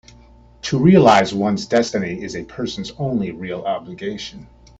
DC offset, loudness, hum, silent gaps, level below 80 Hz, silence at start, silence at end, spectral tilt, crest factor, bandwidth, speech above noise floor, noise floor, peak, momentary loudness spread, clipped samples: under 0.1%; -18 LUFS; none; none; -48 dBFS; 0.65 s; 0.35 s; -6 dB/octave; 18 dB; 8 kHz; 29 dB; -47 dBFS; 0 dBFS; 17 LU; under 0.1%